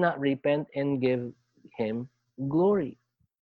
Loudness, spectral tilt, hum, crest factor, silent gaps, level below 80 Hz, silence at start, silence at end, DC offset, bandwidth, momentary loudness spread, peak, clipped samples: -29 LUFS; -10 dB/octave; none; 18 dB; none; -68 dBFS; 0 s; 0.5 s; under 0.1%; 4.9 kHz; 14 LU; -12 dBFS; under 0.1%